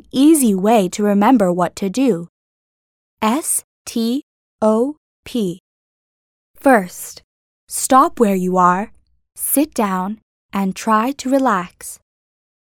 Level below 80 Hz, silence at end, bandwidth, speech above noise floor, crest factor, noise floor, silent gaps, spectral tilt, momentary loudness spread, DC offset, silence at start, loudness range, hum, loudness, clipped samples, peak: -56 dBFS; 0.8 s; 19 kHz; over 74 dB; 18 dB; under -90 dBFS; 2.29-3.17 s, 3.64-3.85 s, 4.23-4.59 s, 4.97-5.23 s, 5.60-6.54 s, 7.24-7.67 s, 10.22-10.49 s; -5 dB/octave; 14 LU; under 0.1%; 0.15 s; 4 LU; none; -17 LUFS; under 0.1%; 0 dBFS